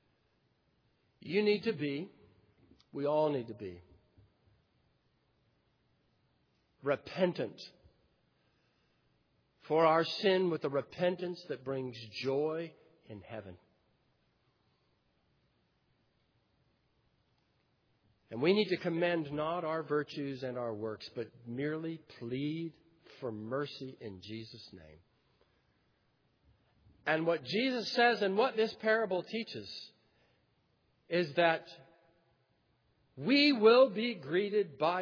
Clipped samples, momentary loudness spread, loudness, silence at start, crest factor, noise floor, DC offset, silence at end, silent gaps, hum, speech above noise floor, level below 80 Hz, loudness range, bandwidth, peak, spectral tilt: under 0.1%; 19 LU; -33 LUFS; 1.25 s; 22 dB; -75 dBFS; under 0.1%; 0 s; none; none; 42 dB; -78 dBFS; 12 LU; 5.4 kHz; -14 dBFS; -3.5 dB/octave